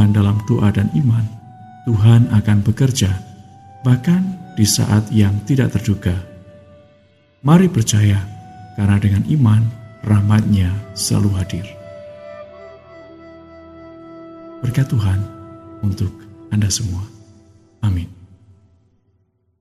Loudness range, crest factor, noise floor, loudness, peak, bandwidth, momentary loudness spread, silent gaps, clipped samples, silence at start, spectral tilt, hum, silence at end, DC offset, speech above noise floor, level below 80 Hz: 9 LU; 18 dB; -62 dBFS; -17 LUFS; 0 dBFS; 13.5 kHz; 22 LU; none; under 0.1%; 0 s; -6 dB/octave; none; 1.45 s; under 0.1%; 47 dB; -46 dBFS